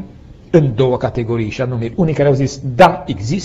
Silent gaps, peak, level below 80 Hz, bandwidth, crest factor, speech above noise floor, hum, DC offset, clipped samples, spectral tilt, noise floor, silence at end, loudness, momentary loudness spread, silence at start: none; 0 dBFS; -38 dBFS; 12 kHz; 14 dB; 23 dB; none; under 0.1%; 0.1%; -7 dB/octave; -37 dBFS; 0 s; -15 LUFS; 9 LU; 0 s